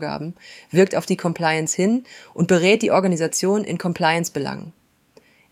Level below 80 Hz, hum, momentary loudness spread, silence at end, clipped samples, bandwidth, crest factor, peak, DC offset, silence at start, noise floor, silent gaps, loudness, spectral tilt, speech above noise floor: -64 dBFS; none; 14 LU; 0.8 s; under 0.1%; 15.5 kHz; 18 dB; -2 dBFS; under 0.1%; 0 s; -55 dBFS; none; -20 LUFS; -4.5 dB/octave; 35 dB